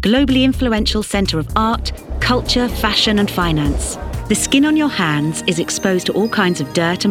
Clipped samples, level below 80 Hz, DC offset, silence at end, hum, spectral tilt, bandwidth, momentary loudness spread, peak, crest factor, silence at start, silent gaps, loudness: under 0.1%; -28 dBFS; under 0.1%; 0 s; none; -4.5 dB/octave; 17 kHz; 6 LU; 0 dBFS; 16 dB; 0 s; none; -16 LUFS